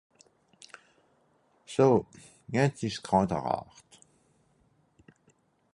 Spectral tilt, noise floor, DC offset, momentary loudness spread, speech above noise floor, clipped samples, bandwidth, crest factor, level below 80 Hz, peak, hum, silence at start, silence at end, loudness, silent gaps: -6.5 dB/octave; -68 dBFS; under 0.1%; 27 LU; 41 dB; under 0.1%; 11.5 kHz; 22 dB; -60 dBFS; -10 dBFS; none; 1.7 s; 2.1 s; -28 LUFS; none